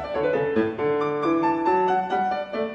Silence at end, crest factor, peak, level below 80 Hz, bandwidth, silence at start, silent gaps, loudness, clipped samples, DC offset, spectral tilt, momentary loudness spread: 0 s; 14 dB; -10 dBFS; -58 dBFS; 7.8 kHz; 0 s; none; -23 LUFS; under 0.1%; under 0.1%; -7.5 dB/octave; 3 LU